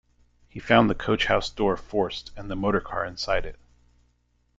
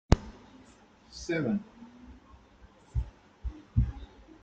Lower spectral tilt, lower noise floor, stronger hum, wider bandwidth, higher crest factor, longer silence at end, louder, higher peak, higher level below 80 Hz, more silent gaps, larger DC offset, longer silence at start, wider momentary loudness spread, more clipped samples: second, -5.5 dB/octave vs -7 dB/octave; first, -68 dBFS vs -58 dBFS; first, 60 Hz at -50 dBFS vs none; about the same, 7.8 kHz vs 8.2 kHz; second, 22 dB vs 32 dB; first, 1.05 s vs 0.35 s; first, -25 LUFS vs -34 LUFS; about the same, -4 dBFS vs -2 dBFS; about the same, -42 dBFS vs -38 dBFS; neither; neither; first, 0.55 s vs 0.1 s; second, 16 LU vs 23 LU; neither